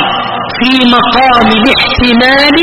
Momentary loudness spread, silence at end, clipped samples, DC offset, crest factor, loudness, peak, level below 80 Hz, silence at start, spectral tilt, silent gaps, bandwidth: 6 LU; 0 s; 0.8%; under 0.1%; 8 dB; -6 LUFS; 0 dBFS; -28 dBFS; 0 s; -5 dB/octave; none; 13 kHz